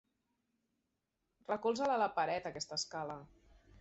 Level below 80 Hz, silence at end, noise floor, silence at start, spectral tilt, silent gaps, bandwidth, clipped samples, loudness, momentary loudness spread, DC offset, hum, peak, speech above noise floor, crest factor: -72 dBFS; 0.55 s; -86 dBFS; 1.5 s; -2 dB/octave; none; 8 kHz; under 0.1%; -37 LUFS; 12 LU; under 0.1%; none; -20 dBFS; 49 dB; 20 dB